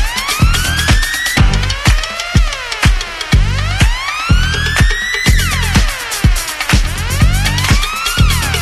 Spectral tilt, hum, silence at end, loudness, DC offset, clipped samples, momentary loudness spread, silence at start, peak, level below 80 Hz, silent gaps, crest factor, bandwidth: -3.5 dB/octave; none; 0 s; -13 LUFS; under 0.1%; under 0.1%; 3 LU; 0 s; 0 dBFS; -16 dBFS; none; 12 dB; 13 kHz